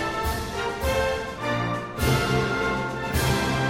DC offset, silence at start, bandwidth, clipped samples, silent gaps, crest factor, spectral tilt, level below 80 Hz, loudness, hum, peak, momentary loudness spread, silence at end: under 0.1%; 0 s; 16.5 kHz; under 0.1%; none; 16 dB; -5 dB/octave; -36 dBFS; -25 LUFS; none; -10 dBFS; 5 LU; 0 s